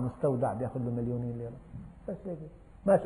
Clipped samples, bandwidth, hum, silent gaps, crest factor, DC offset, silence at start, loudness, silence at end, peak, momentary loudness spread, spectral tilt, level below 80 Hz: under 0.1%; 10.5 kHz; none; none; 20 dB; under 0.1%; 0 s; -34 LUFS; 0 s; -12 dBFS; 16 LU; -10 dB/octave; -54 dBFS